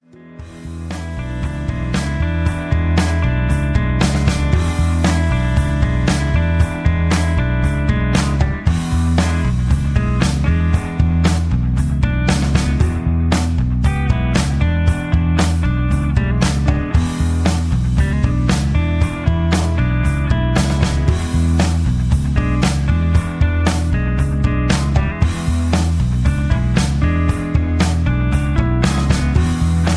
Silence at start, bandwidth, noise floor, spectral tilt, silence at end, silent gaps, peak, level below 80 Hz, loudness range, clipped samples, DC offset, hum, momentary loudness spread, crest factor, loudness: 0.2 s; 11 kHz; -36 dBFS; -6.5 dB/octave; 0 s; none; 0 dBFS; -20 dBFS; 1 LU; under 0.1%; under 0.1%; none; 2 LU; 14 dB; -17 LUFS